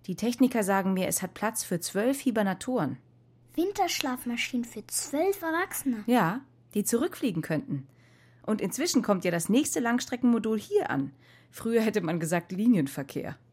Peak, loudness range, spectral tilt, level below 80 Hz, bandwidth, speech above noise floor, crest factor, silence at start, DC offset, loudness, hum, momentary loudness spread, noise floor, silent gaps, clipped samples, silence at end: -6 dBFS; 2 LU; -4.5 dB/octave; -66 dBFS; 16.5 kHz; 30 dB; 22 dB; 0.1 s; under 0.1%; -28 LUFS; none; 9 LU; -58 dBFS; none; under 0.1%; 0.2 s